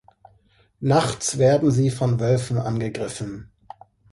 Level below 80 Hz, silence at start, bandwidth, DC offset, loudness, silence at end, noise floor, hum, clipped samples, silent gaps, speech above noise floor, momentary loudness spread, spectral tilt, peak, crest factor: -52 dBFS; 0.8 s; 11.5 kHz; under 0.1%; -22 LUFS; 0.7 s; -59 dBFS; none; under 0.1%; none; 39 dB; 12 LU; -6 dB/octave; -4 dBFS; 20 dB